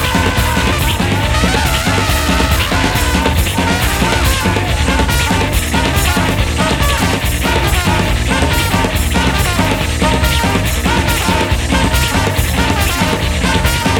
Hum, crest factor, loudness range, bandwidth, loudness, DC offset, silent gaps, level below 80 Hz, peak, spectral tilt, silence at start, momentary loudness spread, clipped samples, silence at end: none; 12 dB; 0 LU; 19 kHz; -13 LUFS; under 0.1%; none; -18 dBFS; 0 dBFS; -4 dB/octave; 0 s; 1 LU; under 0.1%; 0 s